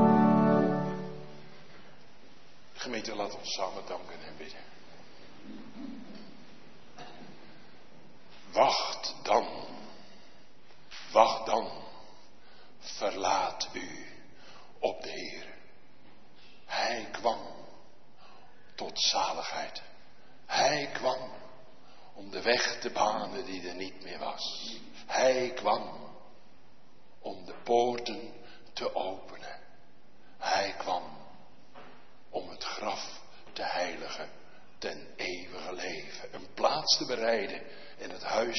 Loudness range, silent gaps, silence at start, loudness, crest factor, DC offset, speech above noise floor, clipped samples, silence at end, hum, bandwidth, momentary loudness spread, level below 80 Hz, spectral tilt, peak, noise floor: 8 LU; none; 0 s; -32 LUFS; 28 dB; 0.7%; 29 dB; under 0.1%; 0 s; none; 6.4 kHz; 24 LU; -68 dBFS; -2.5 dB/octave; -6 dBFS; -62 dBFS